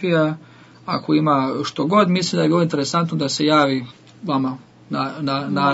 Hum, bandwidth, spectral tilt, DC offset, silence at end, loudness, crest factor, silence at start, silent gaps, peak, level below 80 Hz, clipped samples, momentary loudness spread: none; 8 kHz; -5.5 dB/octave; under 0.1%; 0 s; -19 LUFS; 16 dB; 0 s; none; -2 dBFS; -64 dBFS; under 0.1%; 12 LU